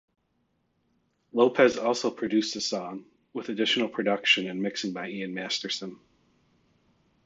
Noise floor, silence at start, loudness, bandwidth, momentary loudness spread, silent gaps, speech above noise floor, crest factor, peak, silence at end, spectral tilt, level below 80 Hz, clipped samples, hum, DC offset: -73 dBFS; 1.35 s; -27 LUFS; 8 kHz; 13 LU; none; 46 dB; 22 dB; -6 dBFS; 1.3 s; -3.5 dB/octave; -72 dBFS; under 0.1%; none; under 0.1%